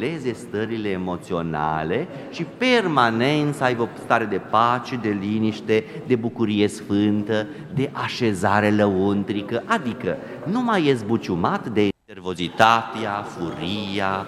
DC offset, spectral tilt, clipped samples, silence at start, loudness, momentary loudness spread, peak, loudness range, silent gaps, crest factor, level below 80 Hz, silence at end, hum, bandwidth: under 0.1%; -6 dB/octave; under 0.1%; 0 s; -22 LUFS; 9 LU; 0 dBFS; 2 LU; none; 22 dB; -56 dBFS; 0 s; none; 13 kHz